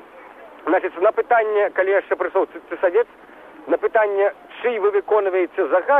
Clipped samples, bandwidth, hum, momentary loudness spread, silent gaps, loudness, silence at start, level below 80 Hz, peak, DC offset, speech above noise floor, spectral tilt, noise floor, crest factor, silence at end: under 0.1%; 3.9 kHz; none; 7 LU; none; -20 LUFS; 0.15 s; -66 dBFS; -6 dBFS; under 0.1%; 23 dB; -6 dB/octave; -42 dBFS; 14 dB; 0 s